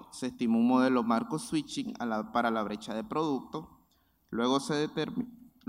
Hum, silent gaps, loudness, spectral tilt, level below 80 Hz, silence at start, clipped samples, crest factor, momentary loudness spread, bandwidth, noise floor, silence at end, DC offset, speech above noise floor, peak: none; none; -31 LUFS; -5.5 dB/octave; -68 dBFS; 0 s; under 0.1%; 18 dB; 13 LU; 14 kHz; -70 dBFS; 0.25 s; under 0.1%; 39 dB; -14 dBFS